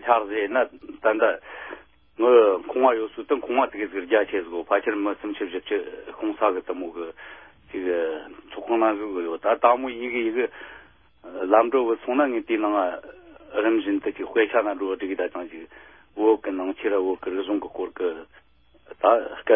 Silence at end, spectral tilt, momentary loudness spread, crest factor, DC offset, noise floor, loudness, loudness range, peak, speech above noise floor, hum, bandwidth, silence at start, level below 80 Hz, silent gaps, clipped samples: 0 s; -8.5 dB/octave; 16 LU; 20 dB; under 0.1%; -58 dBFS; -24 LUFS; 5 LU; -4 dBFS; 34 dB; none; 3.7 kHz; 0 s; -64 dBFS; none; under 0.1%